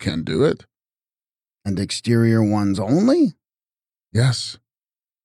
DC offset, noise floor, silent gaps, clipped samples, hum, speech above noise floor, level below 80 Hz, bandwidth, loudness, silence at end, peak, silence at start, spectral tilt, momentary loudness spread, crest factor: under 0.1%; under -90 dBFS; none; under 0.1%; none; over 72 dB; -52 dBFS; 12.5 kHz; -19 LUFS; 0.7 s; -6 dBFS; 0 s; -6.5 dB/octave; 11 LU; 16 dB